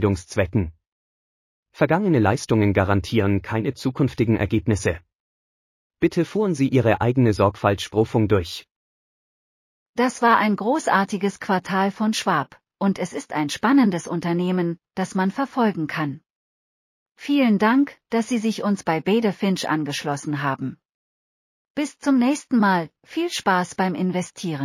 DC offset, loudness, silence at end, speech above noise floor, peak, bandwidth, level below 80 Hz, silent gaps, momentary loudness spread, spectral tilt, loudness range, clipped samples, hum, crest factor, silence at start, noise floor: under 0.1%; -22 LUFS; 0 s; over 69 dB; -4 dBFS; 15 kHz; -50 dBFS; 0.87-1.63 s, 5.15-5.90 s, 8.71-9.94 s, 16.30-17.15 s, 20.94-21.75 s; 9 LU; -6 dB/octave; 3 LU; under 0.1%; none; 18 dB; 0 s; under -90 dBFS